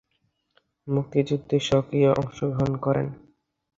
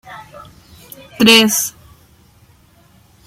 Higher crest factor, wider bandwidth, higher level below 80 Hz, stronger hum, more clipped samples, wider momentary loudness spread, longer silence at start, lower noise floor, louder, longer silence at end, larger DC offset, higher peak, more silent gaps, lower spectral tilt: about the same, 18 dB vs 18 dB; second, 7.8 kHz vs 16.5 kHz; about the same, -52 dBFS vs -54 dBFS; neither; neither; second, 7 LU vs 27 LU; first, 0.85 s vs 0.1 s; first, -73 dBFS vs -50 dBFS; second, -24 LUFS vs -11 LUFS; second, 0.6 s vs 1.55 s; neither; second, -6 dBFS vs 0 dBFS; neither; first, -7 dB/octave vs -2 dB/octave